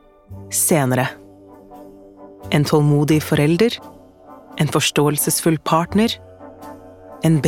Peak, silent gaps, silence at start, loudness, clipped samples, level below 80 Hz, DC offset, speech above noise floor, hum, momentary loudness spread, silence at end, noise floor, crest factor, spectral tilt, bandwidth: -2 dBFS; none; 0.3 s; -18 LUFS; under 0.1%; -52 dBFS; under 0.1%; 26 dB; none; 22 LU; 0 s; -43 dBFS; 16 dB; -5 dB/octave; 17.5 kHz